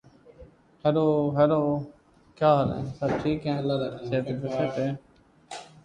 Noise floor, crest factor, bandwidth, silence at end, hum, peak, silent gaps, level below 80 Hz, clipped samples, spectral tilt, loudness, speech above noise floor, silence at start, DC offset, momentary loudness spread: -52 dBFS; 18 dB; 10 kHz; 0.2 s; none; -8 dBFS; none; -56 dBFS; under 0.1%; -8 dB/octave; -26 LUFS; 27 dB; 0.4 s; under 0.1%; 14 LU